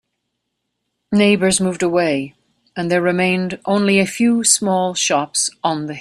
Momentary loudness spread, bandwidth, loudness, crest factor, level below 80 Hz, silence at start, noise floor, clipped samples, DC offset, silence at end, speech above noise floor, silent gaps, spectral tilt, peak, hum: 8 LU; 13.5 kHz; -16 LUFS; 18 dB; -56 dBFS; 1.1 s; -75 dBFS; under 0.1%; under 0.1%; 0 s; 58 dB; none; -3.5 dB/octave; 0 dBFS; none